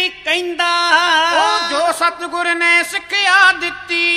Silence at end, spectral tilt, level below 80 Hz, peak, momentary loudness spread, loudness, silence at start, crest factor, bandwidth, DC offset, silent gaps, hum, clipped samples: 0 s; 0 dB/octave; -56 dBFS; 0 dBFS; 7 LU; -14 LUFS; 0 s; 16 dB; 15 kHz; under 0.1%; none; none; under 0.1%